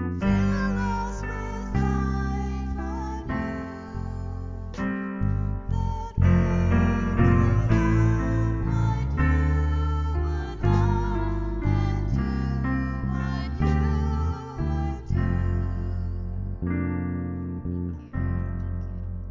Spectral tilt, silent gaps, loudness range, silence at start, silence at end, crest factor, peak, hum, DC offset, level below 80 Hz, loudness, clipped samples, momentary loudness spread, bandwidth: -8.5 dB/octave; none; 8 LU; 0 s; 0 s; 16 dB; -8 dBFS; none; under 0.1%; -30 dBFS; -26 LUFS; under 0.1%; 10 LU; 7.6 kHz